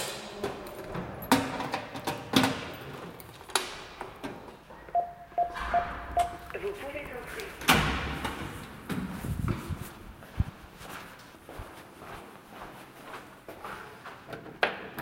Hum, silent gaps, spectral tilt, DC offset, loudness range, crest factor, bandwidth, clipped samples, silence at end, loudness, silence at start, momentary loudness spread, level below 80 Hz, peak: none; none; -4 dB/octave; under 0.1%; 12 LU; 30 dB; 16.5 kHz; under 0.1%; 0 s; -32 LUFS; 0 s; 19 LU; -48 dBFS; -4 dBFS